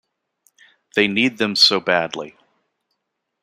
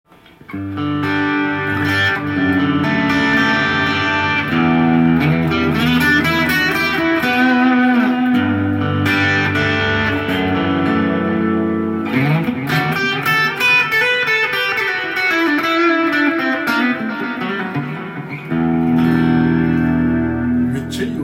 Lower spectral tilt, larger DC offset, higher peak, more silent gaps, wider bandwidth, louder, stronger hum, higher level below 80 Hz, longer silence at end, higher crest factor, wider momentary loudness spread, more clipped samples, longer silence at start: second, -3 dB/octave vs -6 dB/octave; neither; about the same, -2 dBFS vs -2 dBFS; neither; about the same, 15.5 kHz vs 16.5 kHz; about the same, -17 LUFS vs -15 LUFS; neither; second, -68 dBFS vs -46 dBFS; first, 1.15 s vs 0 s; first, 20 dB vs 14 dB; first, 16 LU vs 7 LU; neither; first, 0.95 s vs 0.5 s